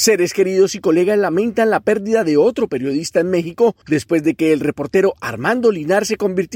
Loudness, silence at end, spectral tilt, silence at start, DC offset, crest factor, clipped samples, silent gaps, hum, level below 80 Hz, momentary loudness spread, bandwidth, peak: -16 LUFS; 0 s; -4.5 dB/octave; 0 s; under 0.1%; 14 dB; under 0.1%; none; none; -54 dBFS; 4 LU; 17 kHz; -2 dBFS